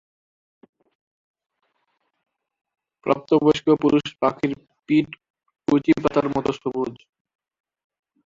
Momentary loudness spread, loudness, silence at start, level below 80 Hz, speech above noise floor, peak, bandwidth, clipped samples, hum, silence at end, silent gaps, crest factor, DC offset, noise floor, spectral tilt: 13 LU; -21 LUFS; 3.05 s; -58 dBFS; 52 dB; -4 dBFS; 7.6 kHz; under 0.1%; none; 1.3 s; 5.30-5.34 s; 20 dB; under 0.1%; -72 dBFS; -7 dB/octave